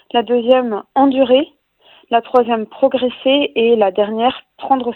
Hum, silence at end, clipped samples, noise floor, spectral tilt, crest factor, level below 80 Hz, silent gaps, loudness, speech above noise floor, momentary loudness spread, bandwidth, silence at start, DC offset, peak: none; 0 s; under 0.1%; -50 dBFS; -7.5 dB/octave; 16 dB; -60 dBFS; none; -15 LUFS; 35 dB; 5 LU; 4.3 kHz; 0.15 s; under 0.1%; 0 dBFS